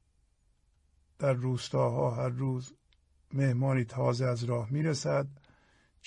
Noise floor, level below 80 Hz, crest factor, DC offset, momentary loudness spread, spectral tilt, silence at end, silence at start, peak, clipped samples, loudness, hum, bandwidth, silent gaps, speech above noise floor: -70 dBFS; -66 dBFS; 16 dB; under 0.1%; 6 LU; -7 dB/octave; 0.7 s; 1.2 s; -16 dBFS; under 0.1%; -31 LUFS; none; 10 kHz; none; 40 dB